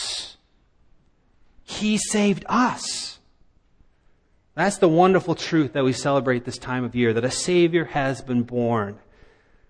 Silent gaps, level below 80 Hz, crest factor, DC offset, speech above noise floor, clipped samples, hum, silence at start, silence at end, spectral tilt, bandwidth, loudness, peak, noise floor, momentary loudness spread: none; -54 dBFS; 18 dB; under 0.1%; 39 dB; under 0.1%; none; 0 s; 0.75 s; -5 dB/octave; 10.5 kHz; -22 LUFS; -4 dBFS; -60 dBFS; 11 LU